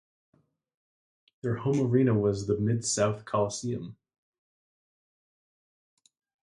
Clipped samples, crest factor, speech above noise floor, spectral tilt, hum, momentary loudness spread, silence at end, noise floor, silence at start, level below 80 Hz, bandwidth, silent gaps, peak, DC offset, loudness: under 0.1%; 20 dB; over 63 dB; -6 dB/octave; none; 12 LU; 2.55 s; under -90 dBFS; 1.45 s; -60 dBFS; 11.5 kHz; none; -12 dBFS; under 0.1%; -28 LUFS